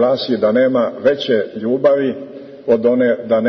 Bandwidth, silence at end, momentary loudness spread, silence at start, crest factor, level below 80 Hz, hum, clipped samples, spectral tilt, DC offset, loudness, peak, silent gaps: 6.2 kHz; 0 s; 8 LU; 0 s; 14 dB; -60 dBFS; none; under 0.1%; -7 dB/octave; under 0.1%; -16 LUFS; -2 dBFS; none